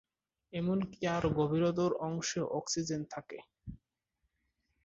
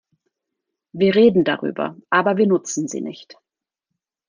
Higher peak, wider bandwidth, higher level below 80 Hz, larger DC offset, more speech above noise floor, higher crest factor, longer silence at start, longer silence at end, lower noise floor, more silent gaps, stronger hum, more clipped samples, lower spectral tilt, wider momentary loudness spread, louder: second, -18 dBFS vs -2 dBFS; second, 8 kHz vs 10 kHz; about the same, -60 dBFS vs -64 dBFS; neither; second, 49 dB vs 64 dB; about the same, 18 dB vs 18 dB; second, 0.55 s vs 0.95 s; about the same, 1.1 s vs 1.05 s; about the same, -83 dBFS vs -82 dBFS; neither; neither; neither; about the same, -5.5 dB/octave vs -5 dB/octave; first, 19 LU vs 14 LU; second, -34 LUFS vs -18 LUFS